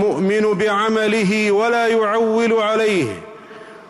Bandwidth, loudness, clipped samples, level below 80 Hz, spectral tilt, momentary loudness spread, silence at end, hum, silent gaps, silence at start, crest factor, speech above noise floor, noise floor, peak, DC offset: 12 kHz; -17 LUFS; under 0.1%; -60 dBFS; -5 dB/octave; 4 LU; 0.1 s; none; none; 0 s; 8 dB; 22 dB; -38 dBFS; -8 dBFS; under 0.1%